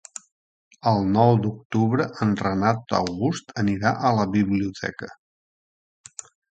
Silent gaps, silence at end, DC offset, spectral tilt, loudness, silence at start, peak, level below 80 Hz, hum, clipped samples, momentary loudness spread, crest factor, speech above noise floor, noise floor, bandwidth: 1.65-1.70 s; 1.45 s; under 0.1%; -6.5 dB/octave; -23 LUFS; 0.85 s; -4 dBFS; -52 dBFS; none; under 0.1%; 21 LU; 20 dB; over 68 dB; under -90 dBFS; 9.2 kHz